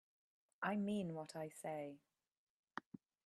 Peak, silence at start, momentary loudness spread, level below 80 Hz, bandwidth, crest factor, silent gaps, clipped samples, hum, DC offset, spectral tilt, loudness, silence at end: -26 dBFS; 0.6 s; 14 LU; -86 dBFS; 13 kHz; 22 dB; 2.37-2.64 s; under 0.1%; none; under 0.1%; -6 dB/octave; -46 LUFS; 0.45 s